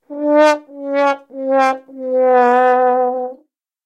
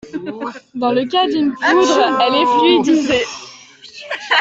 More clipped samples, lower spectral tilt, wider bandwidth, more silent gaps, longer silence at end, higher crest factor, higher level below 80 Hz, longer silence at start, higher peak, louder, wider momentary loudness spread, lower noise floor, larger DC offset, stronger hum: neither; about the same, -3 dB/octave vs -3.5 dB/octave; first, 10 kHz vs 8 kHz; neither; first, 0.5 s vs 0 s; about the same, 14 dB vs 14 dB; second, -90 dBFS vs -56 dBFS; about the same, 0.1 s vs 0.05 s; about the same, 0 dBFS vs -2 dBFS; about the same, -15 LUFS vs -14 LUFS; second, 11 LU vs 16 LU; first, -54 dBFS vs -39 dBFS; neither; neither